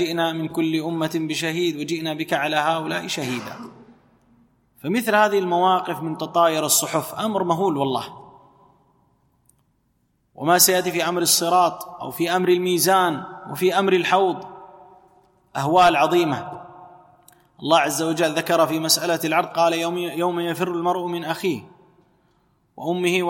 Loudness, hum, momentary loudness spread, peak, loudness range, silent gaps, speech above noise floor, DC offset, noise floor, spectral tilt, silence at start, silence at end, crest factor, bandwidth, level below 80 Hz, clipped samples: -20 LUFS; none; 13 LU; -2 dBFS; 6 LU; none; 46 dB; under 0.1%; -67 dBFS; -3.5 dB/octave; 0 s; 0 s; 20 dB; 16.5 kHz; -64 dBFS; under 0.1%